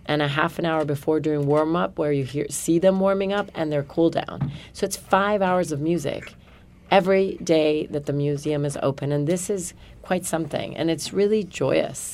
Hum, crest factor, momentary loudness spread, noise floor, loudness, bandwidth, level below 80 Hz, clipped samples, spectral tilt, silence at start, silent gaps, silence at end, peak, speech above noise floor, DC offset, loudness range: none; 20 dB; 8 LU; -49 dBFS; -23 LUFS; 16 kHz; -52 dBFS; under 0.1%; -5.5 dB/octave; 0.05 s; none; 0 s; -4 dBFS; 26 dB; under 0.1%; 3 LU